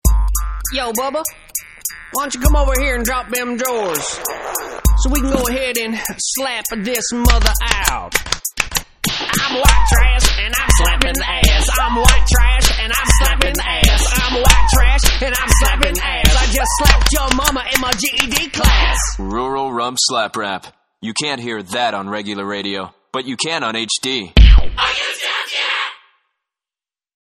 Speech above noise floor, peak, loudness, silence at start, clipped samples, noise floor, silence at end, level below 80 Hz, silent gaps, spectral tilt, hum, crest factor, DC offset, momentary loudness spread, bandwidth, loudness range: over 76 dB; 0 dBFS; -16 LUFS; 0.05 s; under 0.1%; under -90 dBFS; 1.35 s; -18 dBFS; none; -3 dB/octave; none; 14 dB; under 0.1%; 10 LU; 17 kHz; 6 LU